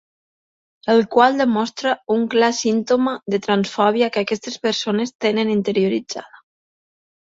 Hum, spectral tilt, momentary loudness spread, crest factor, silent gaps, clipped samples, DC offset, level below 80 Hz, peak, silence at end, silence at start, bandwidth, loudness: none; -4.5 dB/octave; 8 LU; 18 dB; 5.15-5.19 s; under 0.1%; under 0.1%; -64 dBFS; 0 dBFS; 0.95 s; 0.85 s; 7.8 kHz; -19 LUFS